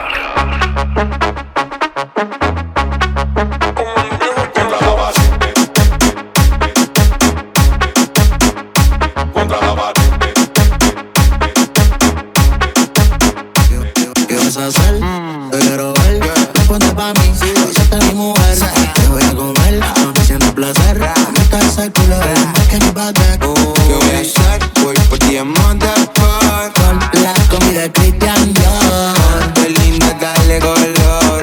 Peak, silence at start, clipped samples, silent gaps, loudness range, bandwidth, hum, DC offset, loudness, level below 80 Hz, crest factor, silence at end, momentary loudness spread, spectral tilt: 0 dBFS; 0 s; under 0.1%; none; 3 LU; 19.5 kHz; none; under 0.1%; -11 LUFS; -14 dBFS; 10 dB; 0 s; 6 LU; -4.5 dB/octave